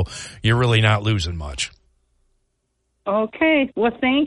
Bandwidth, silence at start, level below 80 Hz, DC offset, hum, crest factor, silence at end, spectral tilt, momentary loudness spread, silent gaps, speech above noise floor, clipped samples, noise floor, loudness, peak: 11 kHz; 0 s; -40 dBFS; under 0.1%; none; 18 dB; 0 s; -5.5 dB/octave; 11 LU; none; 52 dB; under 0.1%; -71 dBFS; -20 LUFS; -2 dBFS